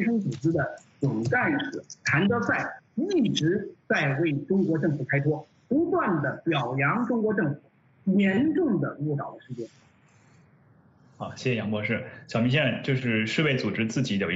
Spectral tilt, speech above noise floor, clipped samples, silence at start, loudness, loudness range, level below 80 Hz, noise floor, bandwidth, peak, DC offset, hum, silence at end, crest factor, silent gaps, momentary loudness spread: -6.5 dB/octave; 33 dB; under 0.1%; 0 s; -26 LUFS; 6 LU; -64 dBFS; -58 dBFS; 8 kHz; -10 dBFS; under 0.1%; none; 0 s; 18 dB; none; 10 LU